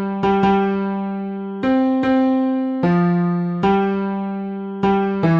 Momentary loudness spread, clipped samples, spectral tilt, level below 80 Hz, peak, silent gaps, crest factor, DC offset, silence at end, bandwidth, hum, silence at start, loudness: 9 LU; under 0.1%; -9.5 dB/octave; -50 dBFS; -4 dBFS; none; 14 dB; under 0.1%; 0 s; 6 kHz; none; 0 s; -19 LUFS